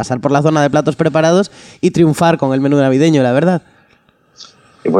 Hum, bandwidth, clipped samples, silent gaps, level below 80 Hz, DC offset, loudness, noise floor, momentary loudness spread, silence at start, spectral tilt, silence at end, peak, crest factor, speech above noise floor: none; 13 kHz; under 0.1%; none; -52 dBFS; under 0.1%; -13 LUFS; -53 dBFS; 6 LU; 0 s; -6.5 dB/octave; 0 s; 0 dBFS; 12 dB; 41 dB